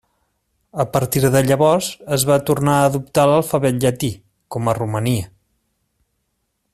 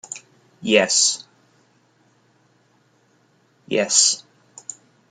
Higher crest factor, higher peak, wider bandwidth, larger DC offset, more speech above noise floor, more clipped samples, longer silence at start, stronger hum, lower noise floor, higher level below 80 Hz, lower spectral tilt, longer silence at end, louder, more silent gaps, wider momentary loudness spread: second, 16 dB vs 24 dB; about the same, -2 dBFS vs 0 dBFS; first, 16 kHz vs 11 kHz; neither; first, 54 dB vs 42 dB; neither; first, 0.75 s vs 0.1 s; neither; first, -71 dBFS vs -60 dBFS; first, -50 dBFS vs -74 dBFS; first, -5.5 dB/octave vs -1 dB/octave; first, 1.45 s vs 0.9 s; about the same, -18 LUFS vs -18 LUFS; neither; second, 10 LU vs 22 LU